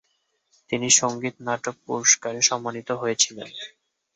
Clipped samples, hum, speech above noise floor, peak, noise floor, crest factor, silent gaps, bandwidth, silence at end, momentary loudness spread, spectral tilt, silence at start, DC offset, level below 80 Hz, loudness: under 0.1%; none; 48 dB; -2 dBFS; -72 dBFS; 22 dB; none; 8.6 kHz; 0.5 s; 17 LU; -1 dB/octave; 0.7 s; under 0.1%; -70 dBFS; -22 LUFS